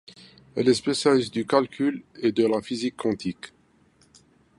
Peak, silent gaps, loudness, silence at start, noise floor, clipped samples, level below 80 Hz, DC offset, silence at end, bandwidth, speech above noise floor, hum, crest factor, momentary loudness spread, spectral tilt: -4 dBFS; none; -24 LUFS; 0.55 s; -61 dBFS; under 0.1%; -64 dBFS; under 0.1%; 1.1 s; 11.5 kHz; 37 dB; none; 22 dB; 12 LU; -5 dB/octave